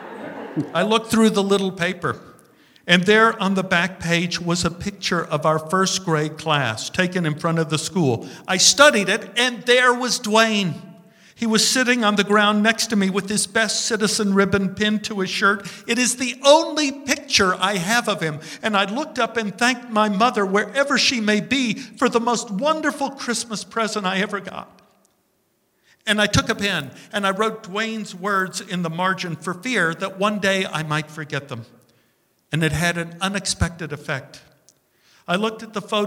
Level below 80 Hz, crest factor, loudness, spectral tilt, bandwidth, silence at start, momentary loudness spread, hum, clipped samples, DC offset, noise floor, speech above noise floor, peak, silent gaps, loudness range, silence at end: -48 dBFS; 20 dB; -20 LUFS; -3.5 dB/octave; 16.5 kHz; 0 s; 11 LU; none; under 0.1%; under 0.1%; -66 dBFS; 46 dB; 0 dBFS; none; 7 LU; 0 s